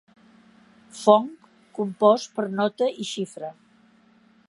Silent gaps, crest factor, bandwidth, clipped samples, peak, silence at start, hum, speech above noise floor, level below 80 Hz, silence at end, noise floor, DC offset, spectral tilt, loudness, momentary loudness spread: none; 24 dB; 11.5 kHz; under 0.1%; -2 dBFS; 0.95 s; none; 36 dB; -78 dBFS; 1 s; -58 dBFS; under 0.1%; -5 dB/octave; -23 LUFS; 19 LU